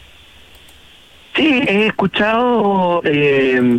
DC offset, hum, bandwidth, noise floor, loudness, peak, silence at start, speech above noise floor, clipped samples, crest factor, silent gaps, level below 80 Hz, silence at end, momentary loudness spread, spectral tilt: under 0.1%; none; 11.5 kHz; -44 dBFS; -14 LUFS; -4 dBFS; 1.35 s; 30 dB; under 0.1%; 12 dB; none; -50 dBFS; 0 s; 3 LU; -6.5 dB/octave